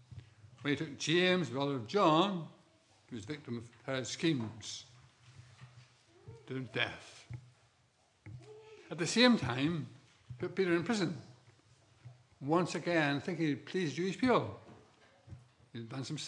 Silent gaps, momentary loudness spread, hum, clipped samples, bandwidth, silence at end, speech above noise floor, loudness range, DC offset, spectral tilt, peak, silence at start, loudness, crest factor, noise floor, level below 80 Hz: none; 23 LU; none; under 0.1%; 11 kHz; 0 s; 38 dB; 10 LU; under 0.1%; -5 dB/octave; -12 dBFS; 0.1 s; -34 LUFS; 24 dB; -71 dBFS; -76 dBFS